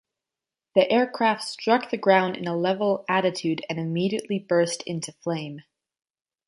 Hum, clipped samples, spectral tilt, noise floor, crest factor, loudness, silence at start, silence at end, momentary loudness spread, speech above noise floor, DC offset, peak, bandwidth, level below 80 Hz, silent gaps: none; under 0.1%; -5 dB/octave; -89 dBFS; 20 dB; -24 LUFS; 0.75 s; 0.85 s; 10 LU; 65 dB; under 0.1%; -4 dBFS; 11.5 kHz; -72 dBFS; none